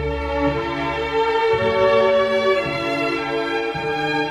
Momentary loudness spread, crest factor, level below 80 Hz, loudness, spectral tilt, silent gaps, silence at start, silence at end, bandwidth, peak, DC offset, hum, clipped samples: 7 LU; 14 dB; -38 dBFS; -20 LUFS; -5.5 dB/octave; none; 0 s; 0 s; 12 kHz; -4 dBFS; under 0.1%; none; under 0.1%